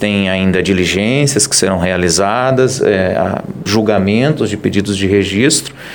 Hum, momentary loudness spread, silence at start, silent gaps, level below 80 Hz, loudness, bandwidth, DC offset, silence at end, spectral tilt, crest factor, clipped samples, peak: none; 4 LU; 0 s; none; -42 dBFS; -13 LUFS; 19 kHz; 0.2%; 0 s; -4 dB/octave; 12 dB; under 0.1%; 0 dBFS